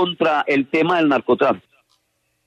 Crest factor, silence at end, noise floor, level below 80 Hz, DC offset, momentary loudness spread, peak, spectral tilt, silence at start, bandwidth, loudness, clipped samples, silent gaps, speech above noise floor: 16 dB; 0.85 s; -69 dBFS; -64 dBFS; under 0.1%; 3 LU; -4 dBFS; -6.5 dB/octave; 0 s; 8.8 kHz; -18 LUFS; under 0.1%; none; 51 dB